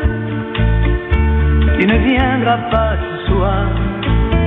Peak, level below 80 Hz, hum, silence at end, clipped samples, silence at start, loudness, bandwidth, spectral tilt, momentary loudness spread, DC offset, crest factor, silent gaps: -2 dBFS; -18 dBFS; none; 0 s; under 0.1%; 0 s; -15 LUFS; 4 kHz; -9.5 dB/octave; 6 LU; under 0.1%; 12 dB; none